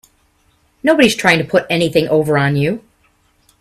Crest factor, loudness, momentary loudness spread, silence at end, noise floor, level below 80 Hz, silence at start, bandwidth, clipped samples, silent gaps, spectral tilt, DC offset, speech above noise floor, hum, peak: 16 dB; -14 LUFS; 8 LU; 0.8 s; -57 dBFS; -52 dBFS; 0.85 s; 15 kHz; under 0.1%; none; -5 dB/octave; under 0.1%; 44 dB; none; 0 dBFS